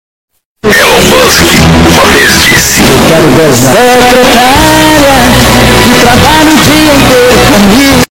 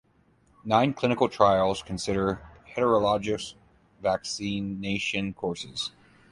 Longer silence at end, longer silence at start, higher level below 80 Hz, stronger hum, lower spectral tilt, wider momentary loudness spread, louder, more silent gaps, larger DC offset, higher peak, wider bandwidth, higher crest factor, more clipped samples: second, 0.05 s vs 0.4 s; about the same, 0.65 s vs 0.65 s; first, -20 dBFS vs -54 dBFS; neither; second, -3.5 dB/octave vs -5 dB/octave; second, 1 LU vs 11 LU; first, -2 LUFS vs -27 LUFS; neither; neither; first, 0 dBFS vs -6 dBFS; first, over 20 kHz vs 11.5 kHz; second, 4 dB vs 22 dB; first, 10% vs under 0.1%